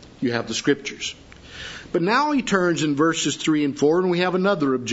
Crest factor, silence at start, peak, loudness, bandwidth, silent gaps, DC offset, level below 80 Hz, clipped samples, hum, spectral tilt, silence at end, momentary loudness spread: 16 dB; 0 s; -6 dBFS; -21 LUFS; 8 kHz; none; under 0.1%; -54 dBFS; under 0.1%; none; -4.5 dB/octave; 0 s; 13 LU